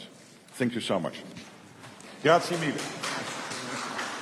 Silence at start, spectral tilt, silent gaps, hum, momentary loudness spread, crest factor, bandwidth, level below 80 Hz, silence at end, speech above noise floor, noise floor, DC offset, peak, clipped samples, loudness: 0 s; -4 dB/octave; none; none; 23 LU; 22 dB; 13.5 kHz; -74 dBFS; 0 s; 24 dB; -51 dBFS; under 0.1%; -8 dBFS; under 0.1%; -29 LUFS